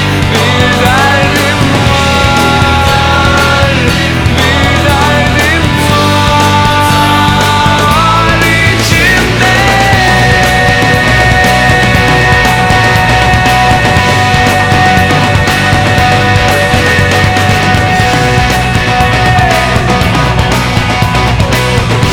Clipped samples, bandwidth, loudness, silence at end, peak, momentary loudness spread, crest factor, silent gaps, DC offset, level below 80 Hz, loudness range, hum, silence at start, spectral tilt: under 0.1%; over 20 kHz; -7 LUFS; 0 s; 0 dBFS; 3 LU; 8 dB; none; under 0.1%; -20 dBFS; 2 LU; none; 0 s; -4.5 dB/octave